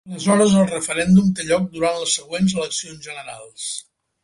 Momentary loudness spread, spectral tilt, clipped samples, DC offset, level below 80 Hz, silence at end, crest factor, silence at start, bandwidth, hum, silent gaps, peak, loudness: 17 LU; -5 dB/octave; under 0.1%; under 0.1%; -52 dBFS; 0.4 s; 16 dB; 0.05 s; 11.5 kHz; none; none; -2 dBFS; -19 LUFS